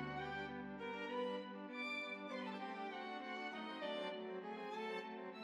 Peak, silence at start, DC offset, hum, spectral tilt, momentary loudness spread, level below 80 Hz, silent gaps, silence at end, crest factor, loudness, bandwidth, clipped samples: -32 dBFS; 0 s; under 0.1%; none; -5.5 dB/octave; 4 LU; -76 dBFS; none; 0 s; 14 dB; -46 LUFS; 12.5 kHz; under 0.1%